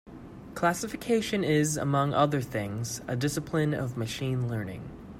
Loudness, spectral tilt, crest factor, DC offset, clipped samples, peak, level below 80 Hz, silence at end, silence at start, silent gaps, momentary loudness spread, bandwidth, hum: -29 LUFS; -5.5 dB/octave; 20 dB; under 0.1%; under 0.1%; -10 dBFS; -56 dBFS; 0 s; 0.05 s; none; 11 LU; 16 kHz; none